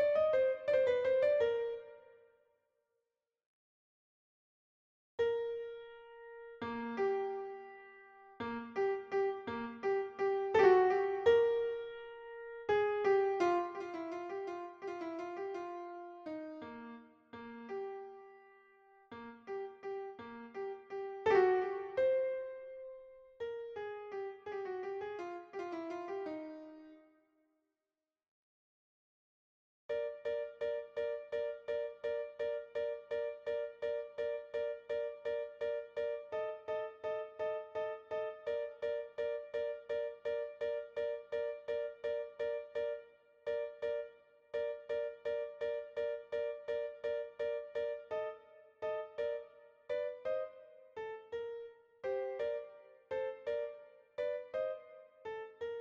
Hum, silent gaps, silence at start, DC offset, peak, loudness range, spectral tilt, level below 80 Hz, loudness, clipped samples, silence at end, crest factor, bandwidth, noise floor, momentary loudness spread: none; 3.46-5.18 s, 28.28-29.89 s; 0 s; under 0.1%; -14 dBFS; 13 LU; -5.5 dB/octave; -76 dBFS; -38 LUFS; under 0.1%; 0 s; 24 dB; 7.2 kHz; under -90 dBFS; 18 LU